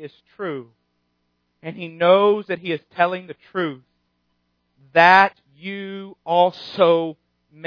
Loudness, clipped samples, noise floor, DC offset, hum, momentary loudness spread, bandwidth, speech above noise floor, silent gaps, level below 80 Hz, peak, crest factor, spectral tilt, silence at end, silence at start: -18 LUFS; under 0.1%; -71 dBFS; under 0.1%; 60 Hz at -55 dBFS; 19 LU; 5.4 kHz; 51 dB; none; -74 dBFS; 0 dBFS; 22 dB; -6.5 dB/octave; 0 s; 0 s